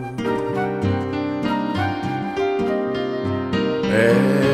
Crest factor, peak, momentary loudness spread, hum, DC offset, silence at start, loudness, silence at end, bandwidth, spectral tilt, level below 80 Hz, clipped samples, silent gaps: 16 dB; -4 dBFS; 8 LU; none; under 0.1%; 0 s; -21 LUFS; 0 s; 13.5 kHz; -7 dB/octave; -50 dBFS; under 0.1%; none